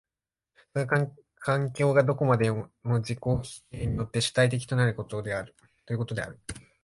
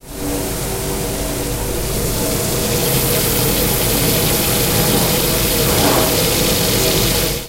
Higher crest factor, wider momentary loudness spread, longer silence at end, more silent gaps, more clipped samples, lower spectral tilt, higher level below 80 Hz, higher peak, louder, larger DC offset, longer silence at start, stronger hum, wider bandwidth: about the same, 18 dB vs 14 dB; first, 12 LU vs 7 LU; first, 0.25 s vs 0 s; neither; neither; first, -6 dB/octave vs -3.5 dB/octave; second, -50 dBFS vs -28 dBFS; second, -10 dBFS vs -2 dBFS; second, -28 LUFS vs -15 LUFS; neither; first, 0.75 s vs 0.05 s; neither; second, 11.5 kHz vs 16 kHz